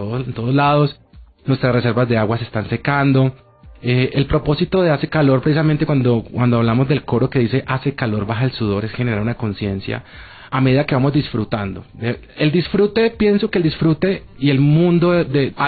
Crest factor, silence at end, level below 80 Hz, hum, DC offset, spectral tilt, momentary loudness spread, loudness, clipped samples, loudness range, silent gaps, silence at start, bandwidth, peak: 12 dB; 0 s; -40 dBFS; none; under 0.1%; -12.5 dB/octave; 8 LU; -17 LUFS; under 0.1%; 4 LU; none; 0 s; 4.8 kHz; -4 dBFS